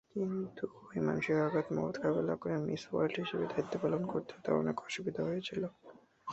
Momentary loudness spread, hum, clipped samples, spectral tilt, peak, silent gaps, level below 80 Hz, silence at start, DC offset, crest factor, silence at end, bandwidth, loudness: 8 LU; none; under 0.1%; -5.5 dB/octave; -16 dBFS; none; -70 dBFS; 0.15 s; under 0.1%; 18 dB; 0 s; 8 kHz; -36 LUFS